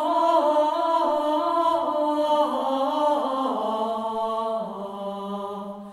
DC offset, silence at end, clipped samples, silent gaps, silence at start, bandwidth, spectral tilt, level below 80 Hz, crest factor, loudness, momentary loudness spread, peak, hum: under 0.1%; 0 s; under 0.1%; none; 0 s; 13 kHz; -5.5 dB/octave; -68 dBFS; 14 dB; -24 LUFS; 12 LU; -8 dBFS; none